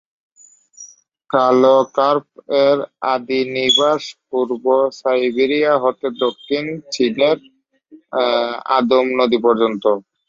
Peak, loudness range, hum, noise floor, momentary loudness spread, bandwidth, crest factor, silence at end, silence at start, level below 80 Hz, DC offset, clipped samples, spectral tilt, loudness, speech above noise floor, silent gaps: -2 dBFS; 3 LU; none; -49 dBFS; 9 LU; 7.6 kHz; 16 dB; 0.3 s; 0.8 s; -64 dBFS; under 0.1%; under 0.1%; -4 dB/octave; -17 LUFS; 32 dB; none